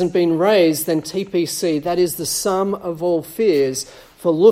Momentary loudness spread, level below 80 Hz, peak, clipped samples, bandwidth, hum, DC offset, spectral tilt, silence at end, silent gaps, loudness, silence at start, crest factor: 8 LU; -54 dBFS; -2 dBFS; under 0.1%; 16.5 kHz; none; under 0.1%; -4.5 dB/octave; 0 s; none; -19 LUFS; 0 s; 16 dB